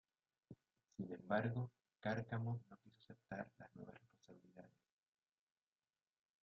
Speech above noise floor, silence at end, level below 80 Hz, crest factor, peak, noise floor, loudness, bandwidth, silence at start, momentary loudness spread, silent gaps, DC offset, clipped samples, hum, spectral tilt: over 43 dB; 1.75 s; -82 dBFS; 24 dB; -26 dBFS; under -90 dBFS; -47 LUFS; 6.4 kHz; 0.5 s; 24 LU; none; under 0.1%; under 0.1%; none; -6.5 dB/octave